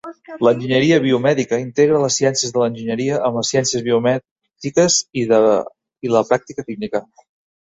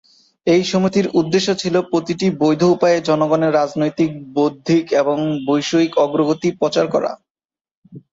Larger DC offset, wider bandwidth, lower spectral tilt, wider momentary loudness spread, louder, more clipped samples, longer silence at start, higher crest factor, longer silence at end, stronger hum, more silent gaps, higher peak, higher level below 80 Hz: neither; about the same, 8.2 kHz vs 7.8 kHz; second, -4 dB/octave vs -6 dB/octave; first, 11 LU vs 5 LU; about the same, -17 LUFS vs -17 LUFS; neither; second, 0.05 s vs 0.45 s; about the same, 16 dB vs 14 dB; first, 0.6 s vs 0.15 s; neither; second, 4.31-4.36 s vs 7.30-7.35 s, 7.45-7.49 s, 7.61-7.65 s, 7.71-7.83 s; about the same, -2 dBFS vs -2 dBFS; about the same, -58 dBFS vs -58 dBFS